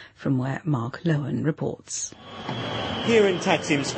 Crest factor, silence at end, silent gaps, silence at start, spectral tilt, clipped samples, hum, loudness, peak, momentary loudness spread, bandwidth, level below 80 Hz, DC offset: 20 dB; 0 s; none; 0 s; -5 dB/octave; under 0.1%; none; -25 LUFS; -6 dBFS; 11 LU; 8.8 kHz; -58 dBFS; under 0.1%